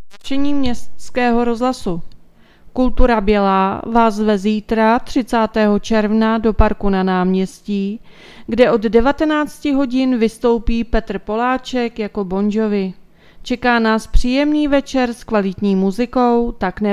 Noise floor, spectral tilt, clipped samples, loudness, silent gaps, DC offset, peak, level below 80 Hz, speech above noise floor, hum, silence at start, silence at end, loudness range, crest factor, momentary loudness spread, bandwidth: -45 dBFS; -6.5 dB/octave; under 0.1%; -17 LUFS; none; under 0.1%; 0 dBFS; -28 dBFS; 30 dB; none; 0 s; 0 s; 3 LU; 16 dB; 8 LU; 12.5 kHz